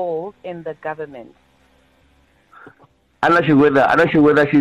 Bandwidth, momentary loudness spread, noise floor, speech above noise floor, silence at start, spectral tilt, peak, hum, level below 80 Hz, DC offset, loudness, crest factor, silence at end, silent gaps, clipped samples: 9 kHz; 18 LU; -56 dBFS; 41 dB; 0 s; -7.5 dB/octave; -6 dBFS; none; -52 dBFS; under 0.1%; -15 LUFS; 12 dB; 0 s; none; under 0.1%